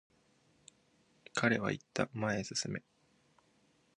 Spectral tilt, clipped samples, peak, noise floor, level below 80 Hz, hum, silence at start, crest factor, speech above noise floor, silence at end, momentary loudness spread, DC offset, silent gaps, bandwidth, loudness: -4.5 dB/octave; under 0.1%; -14 dBFS; -72 dBFS; -70 dBFS; none; 1.35 s; 26 dB; 36 dB; 1.2 s; 9 LU; under 0.1%; none; 10.5 kHz; -36 LUFS